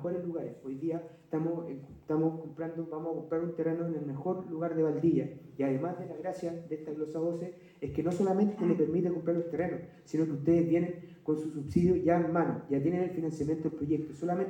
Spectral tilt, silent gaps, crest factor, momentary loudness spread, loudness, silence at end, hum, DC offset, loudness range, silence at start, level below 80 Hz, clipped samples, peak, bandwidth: -9.5 dB/octave; none; 18 dB; 11 LU; -32 LUFS; 0 s; none; under 0.1%; 5 LU; 0 s; -64 dBFS; under 0.1%; -14 dBFS; 9.6 kHz